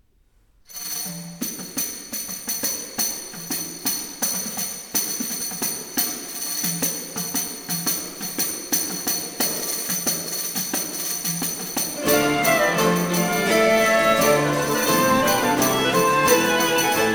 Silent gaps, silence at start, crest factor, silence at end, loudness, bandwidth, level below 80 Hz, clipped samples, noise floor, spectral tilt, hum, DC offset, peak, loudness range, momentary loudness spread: none; 0.7 s; 18 dB; 0 s; -21 LUFS; 19 kHz; -54 dBFS; under 0.1%; -59 dBFS; -2.5 dB/octave; none; under 0.1%; -4 dBFS; 7 LU; 10 LU